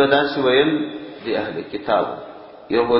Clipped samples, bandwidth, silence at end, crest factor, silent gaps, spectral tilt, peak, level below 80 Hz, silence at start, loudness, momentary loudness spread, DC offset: under 0.1%; 5.8 kHz; 0 s; 18 dB; none; -10 dB/octave; -2 dBFS; -54 dBFS; 0 s; -20 LUFS; 16 LU; under 0.1%